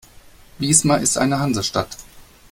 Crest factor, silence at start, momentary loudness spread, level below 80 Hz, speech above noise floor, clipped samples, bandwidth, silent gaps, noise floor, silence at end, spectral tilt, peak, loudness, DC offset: 20 dB; 0.6 s; 14 LU; -48 dBFS; 27 dB; under 0.1%; 16.5 kHz; none; -46 dBFS; 0.3 s; -3.5 dB/octave; 0 dBFS; -18 LUFS; under 0.1%